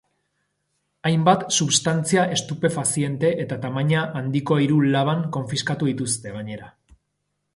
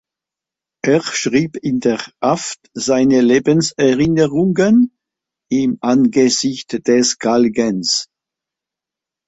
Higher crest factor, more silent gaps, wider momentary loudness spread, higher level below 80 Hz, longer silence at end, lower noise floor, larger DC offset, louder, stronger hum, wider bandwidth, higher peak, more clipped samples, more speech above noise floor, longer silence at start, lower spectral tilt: first, 20 dB vs 14 dB; neither; about the same, 8 LU vs 8 LU; second, -60 dBFS vs -54 dBFS; second, 0.85 s vs 1.25 s; second, -75 dBFS vs -86 dBFS; neither; second, -21 LUFS vs -15 LUFS; first, 50 Hz at -40 dBFS vs none; first, 11.5 kHz vs 8.4 kHz; about the same, -2 dBFS vs -2 dBFS; neither; second, 54 dB vs 72 dB; first, 1.05 s vs 0.85 s; about the same, -4.5 dB/octave vs -4.5 dB/octave